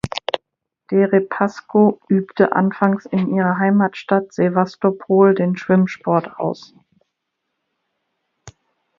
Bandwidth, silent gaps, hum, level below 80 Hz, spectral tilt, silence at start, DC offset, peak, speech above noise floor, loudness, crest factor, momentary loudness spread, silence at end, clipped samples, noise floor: 7.2 kHz; none; none; -56 dBFS; -8 dB/octave; 0.05 s; under 0.1%; 0 dBFS; 60 dB; -18 LUFS; 18 dB; 9 LU; 0.5 s; under 0.1%; -76 dBFS